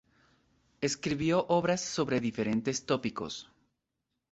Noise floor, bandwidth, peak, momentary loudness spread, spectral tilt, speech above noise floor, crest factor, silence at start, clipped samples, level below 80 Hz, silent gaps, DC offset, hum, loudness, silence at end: -85 dBFS; 8.2 kHz; -14 dBFS; 9 LU; -4.5 dB/octave; 54 dB; 18 dB; 0.8 s; under 0.1%; -64 dBFS; none; under 0.1%; none; -31 LUFS; 0.9 s